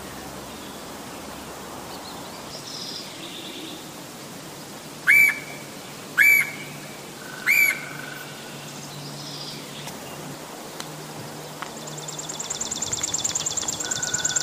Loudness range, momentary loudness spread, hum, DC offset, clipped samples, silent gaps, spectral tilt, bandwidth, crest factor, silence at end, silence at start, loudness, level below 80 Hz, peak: 15 LU; 19 LU; none; under 0.1%; under 0.1%; none; -1 dB/octave; 15.5 kHz; 22 dB; 0 s; 0 s; -23 LUFS; -60 dBFS; -4 dBFS